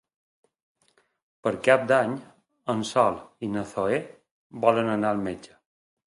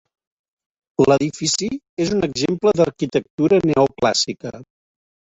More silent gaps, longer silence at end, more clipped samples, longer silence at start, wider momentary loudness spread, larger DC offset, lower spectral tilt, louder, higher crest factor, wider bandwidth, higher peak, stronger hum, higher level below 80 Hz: about the same, 4.31-4.50 s vs 1.89-1.97 s, 3.30-3.38 s; second, 0.6 s vs 0.75 s; neither; first, 1.45 s vs 1 s; first, 16 LU vs 8 LU; neither; about the same, -5.5 dB/octave vs -4.5 dB/octave; second, -25 LUFS vs -19 LUFS; first, 24 dB vs 18 dB; first, 11.5 kHz vs 8.2 kHz; about the same, -4 dBFS vs -2 dBFS; neither; second, -64 dBFS vs -52 dBFS